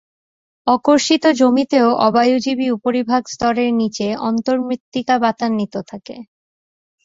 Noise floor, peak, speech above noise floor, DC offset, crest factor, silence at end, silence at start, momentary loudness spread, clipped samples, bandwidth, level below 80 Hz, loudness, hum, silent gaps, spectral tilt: under -90 dBFS; -2 dBFS; over 74 dB; under 0.1%; 16 dB; 0.8 s; 0.65 s; 11 LU; under 0.1%; 7.8 kHz; -56 dBFS; -17 LUFS; none; 4.80-4.92 s; -4.5 dB/octave